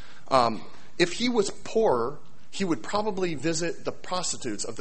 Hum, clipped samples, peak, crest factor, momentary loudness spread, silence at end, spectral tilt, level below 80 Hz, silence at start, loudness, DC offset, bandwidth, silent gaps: none; under 0.1%; -6 dBFS; 22 dB; 10 LU; 0 s; -4 dB/octave; -56 dBFS; 0 s; -27 LUFS; 2%; 8.8 kHz; none